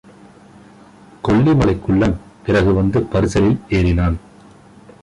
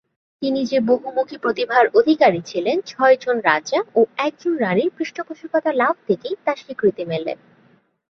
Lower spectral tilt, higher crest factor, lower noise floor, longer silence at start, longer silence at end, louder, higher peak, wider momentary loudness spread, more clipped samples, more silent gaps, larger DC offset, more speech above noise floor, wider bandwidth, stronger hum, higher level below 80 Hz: first, -7.5 dB/octave vs -5.5 dB/octave; second, 12 dB vs 18 dB; second, -44 dBFS vs -57 dBFS; first, 1.25 s vs 0.4 s; about the same, 0.85 s vs 0.85 s; about the same, -17 LUFS vs -19 LUFS; about the same, -4 dBFS vs -2 dBFS; second, 7 LU vs 10 LU; neither; neither; neither; second, 29 dB vs 38 dB; first, 11 kHz vs 6.8 kHz; neither; first, -30 dBFS vs -66 dBFS